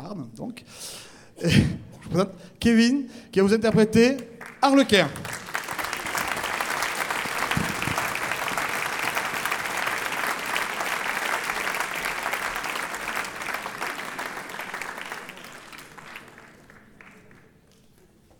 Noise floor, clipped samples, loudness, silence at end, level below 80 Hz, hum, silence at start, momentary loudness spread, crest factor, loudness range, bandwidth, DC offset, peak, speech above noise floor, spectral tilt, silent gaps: -56 dBFS; under 0.1%; -25 LUFS; 1.2 s; -50 dBFS; none; 0 s; 18 LU; 22 dB; 13 LU; 19 kHz; under 0.1%; -4 dBFS; 35 dB; -4.5 dB/octave; none